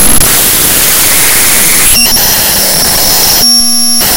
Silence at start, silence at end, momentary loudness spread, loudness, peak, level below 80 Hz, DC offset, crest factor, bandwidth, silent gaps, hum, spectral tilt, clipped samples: 0 s; 0 s; 2 LU; -3 LUFS; 0 dBFS; -24 dBFS; under 0.1%; 6 dB; over 20 kHz; none; none; -0.5 dB/octave; 7%